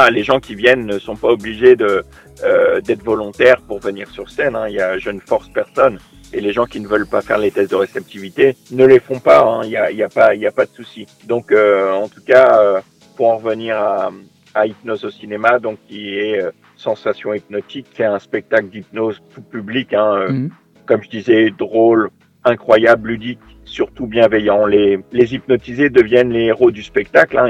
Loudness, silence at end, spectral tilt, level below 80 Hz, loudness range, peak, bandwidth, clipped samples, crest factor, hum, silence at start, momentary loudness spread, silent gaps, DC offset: -15 LUFS; 0 s; -6.5 dB/octave; -48 dBFS; 6 LU; 0 dBFS; 11 kHz; 0.2%; 14 dB; none; 0 s; 14 LU; none; under 0.1%